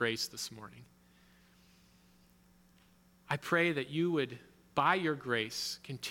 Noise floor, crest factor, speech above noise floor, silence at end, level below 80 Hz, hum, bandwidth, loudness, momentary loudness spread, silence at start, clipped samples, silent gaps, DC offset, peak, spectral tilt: -65 dBFS; 22 dB; 31 dB; 0 s; -74 dBFS; 60 Hz at -65 dBFS; 18 kHz; -34 LUFS; 12 LU; 0 s; under 0.1%; none; under 0.1%; -14 dBFS; -4 dB/octave